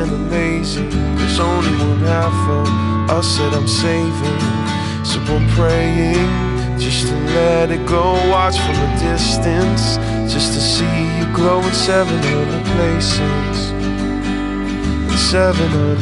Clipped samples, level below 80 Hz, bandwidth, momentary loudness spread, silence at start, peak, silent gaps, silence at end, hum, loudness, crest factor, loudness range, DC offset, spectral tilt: under 0.1%; -26 dBFS; 11.5 kHz; 5 LU; 0 s; -2 dBFS; none; 0 s; none; -16 LUFS; 14 dB; 1 LU; under 0.1%; -5.5 dB/octave